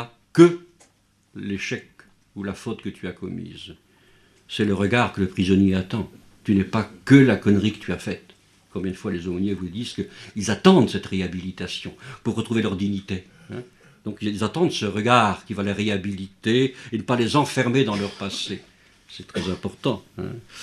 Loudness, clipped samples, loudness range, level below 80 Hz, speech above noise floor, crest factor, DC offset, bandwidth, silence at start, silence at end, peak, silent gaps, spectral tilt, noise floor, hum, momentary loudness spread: -23 LUFS; under 0.1%; 8 LU; -56 dBFS; 39 dB; 22 dB; under 0.1%; 12.5 kHz; 0 s; 0 s; 0 dBFS; none; -6 dB/octave; -61 dBFS; none; 19 LU